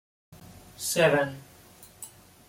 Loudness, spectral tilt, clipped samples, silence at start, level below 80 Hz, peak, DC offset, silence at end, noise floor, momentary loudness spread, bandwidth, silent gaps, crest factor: -25 LUFS; -3.5 dB/octave; under 0.1%; 0.3 s; -64 dBFS; -8 dBFS; under 0.1%; 0.4 s; -53 dBFS; 23 LU; 16.5 kHz; none; 22 dB